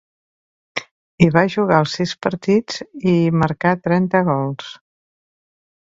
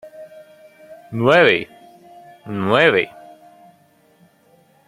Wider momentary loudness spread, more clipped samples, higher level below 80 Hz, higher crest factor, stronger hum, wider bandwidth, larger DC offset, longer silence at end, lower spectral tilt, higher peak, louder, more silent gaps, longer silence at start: second, 14 LU vs 26 LU; neither; first, -52 dBFS vs -64 dBFS; about the same, 18 dB vs 20 dB; neither; second, 7.6 kHz vs 14.5 kHz; neither; second, 1.1 s vs 1.8 s; about the same, -7 dB/octave vs -6 dB/octave; about the same, 0 dBFS vs -2 dBFS; about the same, -18 LUFS vs -16 LUFS; first, 0.91-1.18 s vs none; first, 0.75 s vs 0.05 s